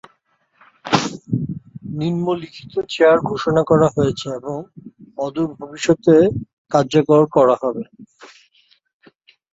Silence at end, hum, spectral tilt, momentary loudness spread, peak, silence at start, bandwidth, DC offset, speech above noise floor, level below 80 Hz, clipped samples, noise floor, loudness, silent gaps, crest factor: 1.25 s; none; -6.5 dB/octave; 16 LU; -2 dBFS; 0.85 s; 8 kHz; under 0.1%; 46 dB; -52 dBFS; under 0.1%; -63 dBFS; -18 LUFS; 6.53-6.65 s; 18 dB